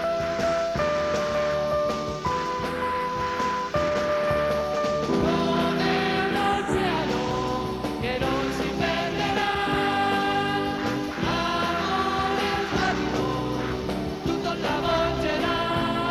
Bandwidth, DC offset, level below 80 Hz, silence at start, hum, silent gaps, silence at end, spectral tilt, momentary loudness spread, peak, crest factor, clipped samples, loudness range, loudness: 15 kHz; under 0.1%; -44 dBFS; 0 s; none; none; 0 s; -5 dB/octave; 4 LU; -10 dBFS; 14 dB; under 0.1%; 2 LU; -25 LUFS